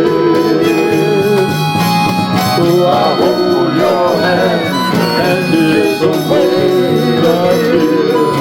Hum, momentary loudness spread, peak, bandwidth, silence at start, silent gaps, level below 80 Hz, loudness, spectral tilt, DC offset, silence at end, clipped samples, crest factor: none; 2 LU; 0 dBFS; 17 kHz; 0 s; none; -50 dBFS; -11 LUFS; -6 dB/octave; under 0.1%; 0 s; under 0.1%; 10 dB